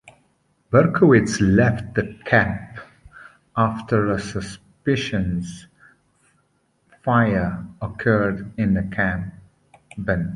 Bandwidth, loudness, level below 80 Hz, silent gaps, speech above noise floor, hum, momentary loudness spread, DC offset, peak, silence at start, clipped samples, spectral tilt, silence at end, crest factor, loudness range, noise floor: 11.5 kHz; -21 LUFS; -42 dBFS; none; 46 dB; none; 16 LU; under 0.1%; -2 dBFS; 0.05 s; under 0.1%; -7 dB/octave; 0 s; 20 dB; 6 LU; -65 dBFS